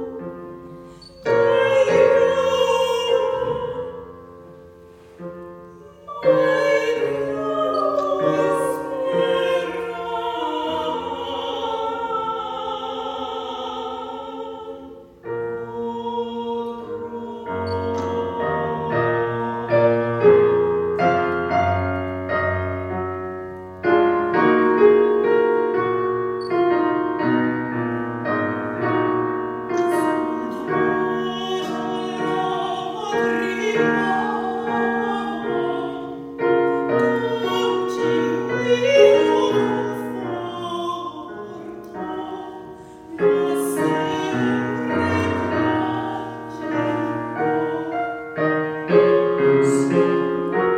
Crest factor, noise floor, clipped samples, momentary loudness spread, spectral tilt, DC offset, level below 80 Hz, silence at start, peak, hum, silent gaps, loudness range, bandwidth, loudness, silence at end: 20 dB; -45 dBFS; under 0.1%; 15 LU; -6 dB/octave; under 0.1%; -56 dBFS; 0 s; -2 dBFS; none; none; 8 LU; 15 kHz; -21 LUFS; 0 s